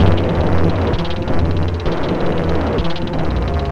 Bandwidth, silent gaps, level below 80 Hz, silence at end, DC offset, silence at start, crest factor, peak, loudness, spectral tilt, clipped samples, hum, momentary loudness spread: 7.2 kHz; none; -24 dBFS; 0 s; under 0.1%; 0 s; 14 dB; 0 dBFS; -18 LUFS; -8 dB/octave; under 0.1%; none; 4 LU